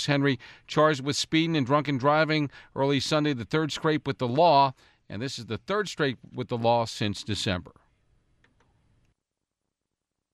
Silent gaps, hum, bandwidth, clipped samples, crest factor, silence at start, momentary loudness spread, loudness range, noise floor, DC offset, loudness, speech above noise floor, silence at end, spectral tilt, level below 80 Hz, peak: none; none; 13 kHz; under 0.1%; 18 dB; 0 s; 11 LU; 7 LU; -85 dBFS; under 0.1%; -26 LUFS; 59 dB; 2.7 s; -5 dB/octave; -62 dBFS; -8 dBFS